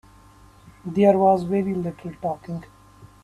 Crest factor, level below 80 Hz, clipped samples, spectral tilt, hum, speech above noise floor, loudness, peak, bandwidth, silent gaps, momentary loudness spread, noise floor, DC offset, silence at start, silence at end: 18 dB; -56 dBFS; under 0.1%; -9 dB/octave; none; 29 dB; -22 LUFS; -4 dBFS; 12 kHz; none; 18 LU; -50 dBFS; under 0.1%; 0.65 s; 0.2 s